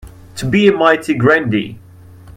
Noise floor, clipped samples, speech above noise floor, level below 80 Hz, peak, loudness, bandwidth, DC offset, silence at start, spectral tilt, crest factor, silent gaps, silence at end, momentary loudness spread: -38 dBFS; under 0.1%; 25 dB; -46 dBFS; 0 dBFS; -13 LUFS; 15.5 kHz; under 0.1%; 0.05 s; -6 dB/octave; 16 dB; none; 0.05 s; 16 LU